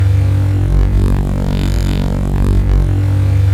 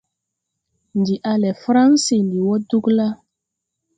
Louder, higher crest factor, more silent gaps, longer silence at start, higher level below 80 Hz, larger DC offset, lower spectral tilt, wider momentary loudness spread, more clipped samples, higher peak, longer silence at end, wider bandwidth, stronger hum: first, -14 LUFS vs -18 LUFS; second, 8 dB vs 16 dB; neither; second, 0 s vs 0.95 s; first, -16 dBFS vs -62 dBFS; neither; first, -8 dB/octave vs -5.5 dB/octave; second, 4 LU vs 10 LU; neither; about the same, -2 dBFS vs -4 dBFS; second, 0 s vs 0.8 s; first, 12.5 kHz vs 9.4 kHz; neither